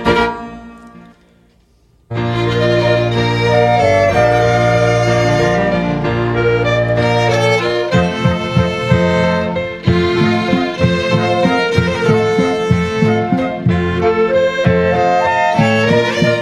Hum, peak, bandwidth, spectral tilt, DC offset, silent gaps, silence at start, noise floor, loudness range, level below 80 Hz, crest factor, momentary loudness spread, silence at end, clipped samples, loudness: none; 0 dBFS; 11.5 kHz; -6.5 dB/octave; under 0.1%; none; 0 s; -52 dBFS; 2 LU; -36 dBFS; 14 dB; 4 LU; 0 s; under 0.1%; -14 LUFS